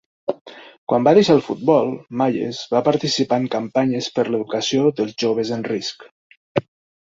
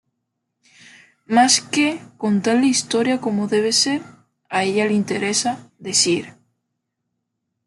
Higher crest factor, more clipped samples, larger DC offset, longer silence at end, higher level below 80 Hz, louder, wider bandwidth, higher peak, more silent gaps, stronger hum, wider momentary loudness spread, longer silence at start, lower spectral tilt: about the same, 18 dB vs 18 dB; neither; neither; second, 0.45 s vs 1.35 s; first, -60 dBFS vs -68 dBFS; about the same, -20 LUFS vs -19 LUFS; second, 7.8 kHz vs 12 kHz; about the same, -2 dBFS vs -2 dBFS; first, 0.41-0.45 s, 0.78-0.87 s, 6.11-6.30 s, 6.37-6.55 s vs none; neither; about the same, 11 LU vs 10 LU; second, 0.3 s vs 1.3 s; first, -5.5 dB/octave vs -3 dB/octave